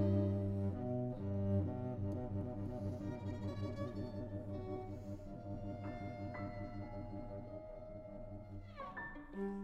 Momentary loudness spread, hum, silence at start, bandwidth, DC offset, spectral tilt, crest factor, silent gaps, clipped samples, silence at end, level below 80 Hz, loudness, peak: 13 LU; none; 0 s; 6.6 kHz; under 0.1%; -9.5 dB/octave; 18 dB; none; under 0.1%; 0 s; -56 dBFS; -44 LUFS; -24 dBFS